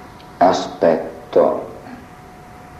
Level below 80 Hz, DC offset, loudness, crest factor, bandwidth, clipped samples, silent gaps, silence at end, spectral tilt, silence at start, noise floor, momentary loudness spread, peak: -52 dBFS; under 0.1%; -17 LUFS; 18 dB; 13.5 kHz; under 0.1%; none; 0 s; -5.5 dB/octave; 0 s; -39 dBFS; 21 LU; -2 dBFS